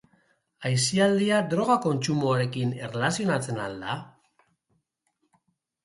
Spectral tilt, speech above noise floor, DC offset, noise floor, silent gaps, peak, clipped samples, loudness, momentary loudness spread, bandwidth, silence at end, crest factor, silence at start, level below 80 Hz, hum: -5 dB/octave; 50 dB; under 0.1%; -75 dBFS; none; -10 dBFS; under 0.1%; -26 LUFS; 11 LU; 11.5 kHz; 1.75 s; 18 dB; 0.6 s; -66 dBFS; none